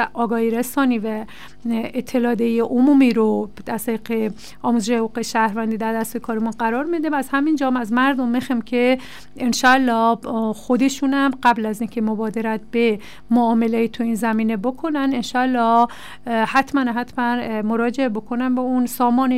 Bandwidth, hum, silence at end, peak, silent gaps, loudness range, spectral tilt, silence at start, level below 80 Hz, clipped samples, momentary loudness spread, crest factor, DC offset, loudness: 16 kHz; none; 0 s; -6 dBFS; none; 2 LU; -5 dB/octave; 0 s; -54 dBFS; under 0.1%; 8 LU; 14 dB; 1%; -20 LUFS